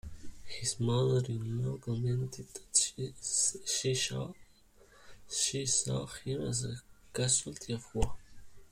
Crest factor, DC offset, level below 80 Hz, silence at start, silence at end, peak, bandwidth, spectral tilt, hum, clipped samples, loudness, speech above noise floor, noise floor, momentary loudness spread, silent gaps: 22 dB; under 0.1%; -50 dBFS; 0.05 s; 0.05 s; -12 dBFS; 15.5 kHz; -3.5 dB/octave; none; under 0.1%; -33 LUFS; 28 dB; -62 dBFS; 12 LU; none